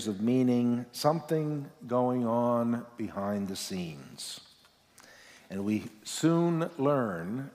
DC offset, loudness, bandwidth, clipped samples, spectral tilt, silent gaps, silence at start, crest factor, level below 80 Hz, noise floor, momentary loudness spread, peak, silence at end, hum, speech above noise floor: under 0.1%; -30 LUFS; 16 kHz; under 0.1%; -6 dB/octave; none; 0 s; 18 dB; -74 dBFS; -62 dBFS; 13 LU; -12 dBFS; 0.05 s; none; 32 dB